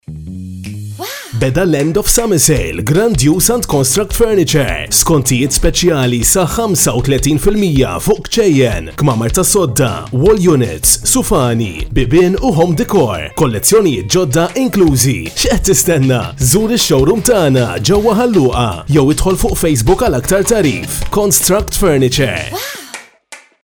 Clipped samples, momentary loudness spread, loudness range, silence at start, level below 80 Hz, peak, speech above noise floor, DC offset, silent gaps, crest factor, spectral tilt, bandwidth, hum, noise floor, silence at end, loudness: under 0.1%; 7 LU; 1 LU; 0.1 s; -24 dBFS; 0 dBFS; 27 dB; under 0.1%; none; 12 dB; -4.5 dB/octave; over 20 kHz; none; -38 dBFS; 0.25 s; -12 LUFS